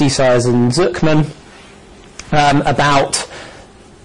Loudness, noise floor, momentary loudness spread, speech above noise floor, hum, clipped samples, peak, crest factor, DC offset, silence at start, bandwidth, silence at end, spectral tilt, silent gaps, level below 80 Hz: -14 LUFS; -40 dBFS; 21 LU; 27 dB; none; under 0.1%; -4 dBFS; 12 dB; under 0.1%; 0 s; 11 kHz; 0 s; -5 dB/octave; none; -38 dBFS